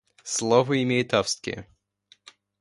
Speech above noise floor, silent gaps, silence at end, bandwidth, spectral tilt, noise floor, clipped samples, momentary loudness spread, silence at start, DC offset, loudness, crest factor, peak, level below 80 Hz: 38 dB; none; 0.95 s; 11.5 kHz; -4 dB/octave; -61 dBFS; under 0.1%; 12 LU; 0.25 s; under 0.1%; -24 LUFS; 22 dB; -6 dBFS; -60 dBFS